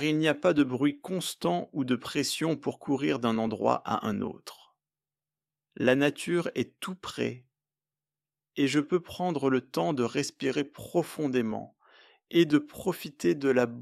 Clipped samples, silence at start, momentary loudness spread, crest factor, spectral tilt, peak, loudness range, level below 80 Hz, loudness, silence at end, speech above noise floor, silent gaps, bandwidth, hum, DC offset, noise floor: under 0.1%; 0 s; 9 LU; 20 dB; -5.5 dB/octave; -8 dBFS; 3 LU; -70 dBFS; -29 LUFS; 0 s; over 62 dB; none; 15 kHz; none; under 0.1%; under -90 dBFS